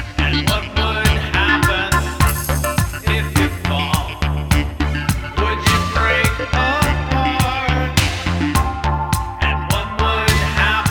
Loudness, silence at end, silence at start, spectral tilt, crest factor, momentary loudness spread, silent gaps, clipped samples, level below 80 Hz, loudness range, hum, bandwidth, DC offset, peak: -17 LUFS; 0 s; 0 s; -4.5 dB/octave; 16 dB; 5 LU; none; under 0.1%; -24 dBFS; 2 LU; none; 19 kHz; under 0.1%; -2 dBFS